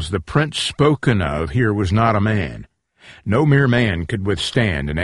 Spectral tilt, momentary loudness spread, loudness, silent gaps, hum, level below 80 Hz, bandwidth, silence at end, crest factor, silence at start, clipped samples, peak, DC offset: -6 dB/octave; 8 LU; -18 LUFS; none; none; -36 dBFS; 11.5 kHz; 0 s; 18 dB; 0 s; under 0.1%; 0 dBFS; under 0.1%